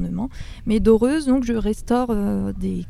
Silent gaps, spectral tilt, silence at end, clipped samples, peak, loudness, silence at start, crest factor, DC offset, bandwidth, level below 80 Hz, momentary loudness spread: none; -7 dB/octave; 0 s; under 0.1%; -4 dBFS; -20 LUFS; 0 s; 16 dB; under 0.1%; 14 kHz; -34 dBFS; 11 LU